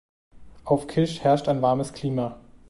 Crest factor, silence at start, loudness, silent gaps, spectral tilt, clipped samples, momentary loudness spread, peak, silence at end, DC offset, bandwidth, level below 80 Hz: 18 dB; 0.35 s; -24 LUFS; none; -7 dB/octave; under 0.1%; 8 LU; -8 dBFS; 0.15 s; under 0.1%; 11.5 kHz; -54 dBFS